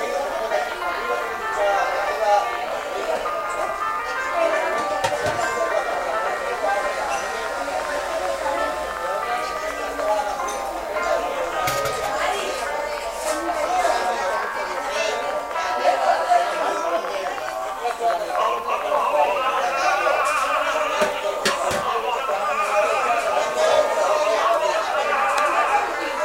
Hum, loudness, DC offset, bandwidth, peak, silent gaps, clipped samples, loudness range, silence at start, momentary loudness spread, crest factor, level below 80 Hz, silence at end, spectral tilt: none; -22 LUFS; under 0.1%; 16 kHz; -4 dBFS; none; under 0.1%; 4 LU; 0 s; 6 LU; 18 dB; -52 dBFS; 0 s; -2 dB/octave